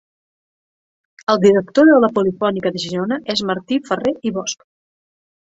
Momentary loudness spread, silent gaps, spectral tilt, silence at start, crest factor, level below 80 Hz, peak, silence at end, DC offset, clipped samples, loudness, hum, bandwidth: 12 LU; none; -5 dB/octave; 1.3 s; 16 dB; -58 dBFS; -2 dBFS; 0.95 s; under 0.1%; under 0.1%; -17 LUFS; none; 8 kHz